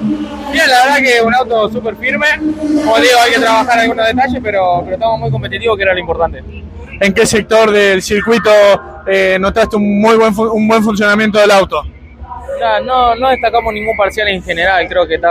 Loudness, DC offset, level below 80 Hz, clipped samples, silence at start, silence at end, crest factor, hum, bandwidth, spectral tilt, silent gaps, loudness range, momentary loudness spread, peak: -11 LUFS; under 0.1%; -36 dBFS; under 0.1%; 0 s; 0 s; 12 dB; none; 16 kHz; -4 dB/octave; none; 3 LU; 9 LU; 0 dBFS